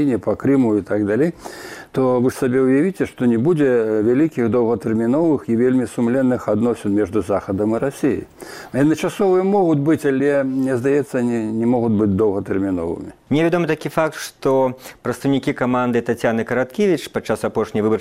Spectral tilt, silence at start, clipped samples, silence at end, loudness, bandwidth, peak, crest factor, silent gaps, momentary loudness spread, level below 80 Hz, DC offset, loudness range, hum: -7 dB/octave; 0 s; under 0.1%; 0 s; -19 LUFS; 15.5 kHz; -2 dBFS; 16 dB; none; 6 LU; -52 dBFS; under 0.1%; 3 LU; none